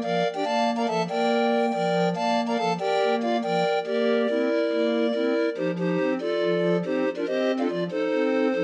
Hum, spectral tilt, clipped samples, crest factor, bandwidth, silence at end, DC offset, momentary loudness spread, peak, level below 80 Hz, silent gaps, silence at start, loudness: none; -6 dB/octave; under 0.1%; 12 dB; 9.4 kHz; 0 s; under 0.1%; 3 LU; -12 dBFS; -80 dBFS; none; 0 s; -24 LUFS